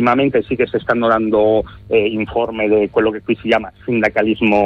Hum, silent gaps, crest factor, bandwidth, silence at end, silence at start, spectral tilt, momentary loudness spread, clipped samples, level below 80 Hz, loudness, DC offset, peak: none; none; 14 dB; 6.6 kHz; 0 s; 0 s; -7.5 dB/octave; 5 LU; under 0.1%; -44 dBFS; -16 LUFS; under 0.1%; -2 dBFS